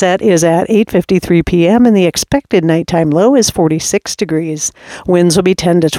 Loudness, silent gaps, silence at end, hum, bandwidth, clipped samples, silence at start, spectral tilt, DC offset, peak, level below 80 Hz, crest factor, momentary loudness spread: -11 LUFS; none; 0 s; none; 16.5 kHz; under 0.1%; 0 s; -5 dB/octave; under 0.1%; 0 dBFS; -38 dBFS; 10 dB; 7 LU